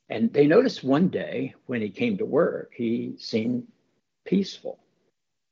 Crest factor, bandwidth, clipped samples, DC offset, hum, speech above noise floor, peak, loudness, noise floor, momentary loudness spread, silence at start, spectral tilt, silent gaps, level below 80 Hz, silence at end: 18 dB; 7.4 kHz; under 0.1%; under 0.1%; none; 52 dB; -6 dBFS; -25 LUFS; -76 dBFS; 13 LU; 0.1 s; -7.5 dB/octave; none; -74 dBFS; 0.8 s